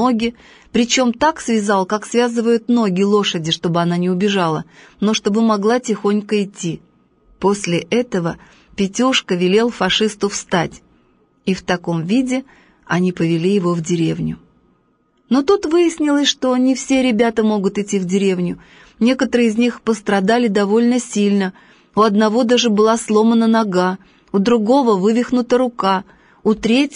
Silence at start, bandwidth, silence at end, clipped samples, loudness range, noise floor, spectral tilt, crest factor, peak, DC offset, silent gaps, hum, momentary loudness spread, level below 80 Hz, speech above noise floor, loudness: 0 s; 10 kHz; 0 s; under 0.1%; 4 LU; -60 dBFS; -5 dB/octave; 14 dB; -2 dBFS; under 0.1%; none; none; 8 LU; -52 dBFS; 44 dB; -17 LUFS